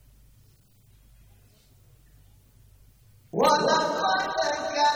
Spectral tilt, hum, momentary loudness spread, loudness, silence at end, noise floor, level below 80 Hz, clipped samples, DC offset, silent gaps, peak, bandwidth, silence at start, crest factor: -3 dB/octave; none; 6 LU; -24 LUFS; 0 s; -58 dBFS; -60 dBFS; under 0.1%; under 0.1%; none; -8 dBFS; over 20 kHz; 3.35 s; 20 dB